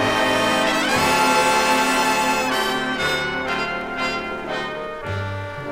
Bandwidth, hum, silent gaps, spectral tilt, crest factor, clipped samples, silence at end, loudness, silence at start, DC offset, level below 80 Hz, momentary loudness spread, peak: 16.5 kHz; none; none; -3 dB/octave; 14 dB; under 0.1%; 0 s; -20 LUFS; 0 s; under 0.1%; -46 dBFS; 11 LU; -6 dBFS